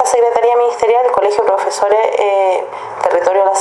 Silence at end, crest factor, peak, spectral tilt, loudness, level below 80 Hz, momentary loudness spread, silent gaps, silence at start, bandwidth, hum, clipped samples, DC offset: 0 s; 12 dB; 0 dBFS; -2 dB/octave; -13 LUFS; -56 dBFS; 4 LU; none; 0 s; 12 kHz; none; under 0.1%; under 0.1%